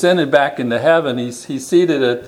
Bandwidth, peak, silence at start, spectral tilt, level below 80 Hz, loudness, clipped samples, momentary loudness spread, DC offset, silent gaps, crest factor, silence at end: 14.5 kHz; 0 dBFS; 0 s; -5 dB/octave; -62 dBFS; -15 LUFS; under 0.1%; 10 LU; under 0.1%; none; 16 dB; 0 s